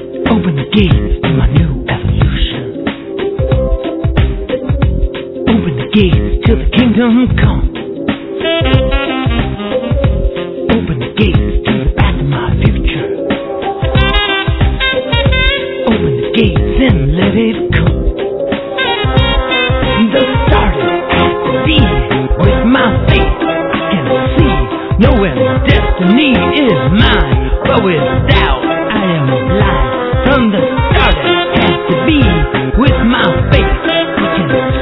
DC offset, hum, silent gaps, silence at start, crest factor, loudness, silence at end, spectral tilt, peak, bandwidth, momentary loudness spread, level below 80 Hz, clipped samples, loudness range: under 0.1%; none; none; 0 s; 10 dB; -12 LUFS; 0 s; -9.5 dB/octave; 0 dBFS; 5.4 kHz; 7 LU; -18 dBFS; 0.2%; 4 LU